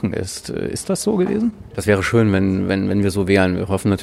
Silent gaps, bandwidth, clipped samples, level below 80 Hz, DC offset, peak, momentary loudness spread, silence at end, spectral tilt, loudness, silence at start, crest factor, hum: none; 14 kHz; under 0.1%; -46 dBFS; under 0.1%; -2 dBFS; 9 LU; 0 s; -6 dB/octave; -19 LUFS; 0 s; 16 dB; none